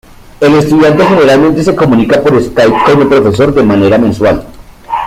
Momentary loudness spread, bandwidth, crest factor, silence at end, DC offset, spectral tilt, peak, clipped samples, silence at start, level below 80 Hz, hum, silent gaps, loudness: 4 LU; 15.5 kHz; 8 dB; 0 s; under 0.1%; -7 dB/octave; 0 dBFS; under 0.1%; 0.4 s; -32 dBFS; none; none; -7 LUFS